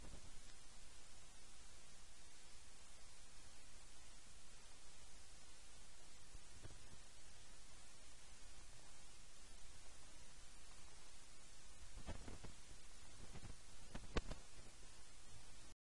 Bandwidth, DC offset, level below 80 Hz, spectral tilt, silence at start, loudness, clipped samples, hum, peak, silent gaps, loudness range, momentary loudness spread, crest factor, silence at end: 11.5 kHz; 0.3%; -62 dBFS; -3 dB/octave; 0 s; -60 LUFS; under 0.1%; none; -22 dBFS; none; 6 LU; 5 LU; 34 dB; 0.25 s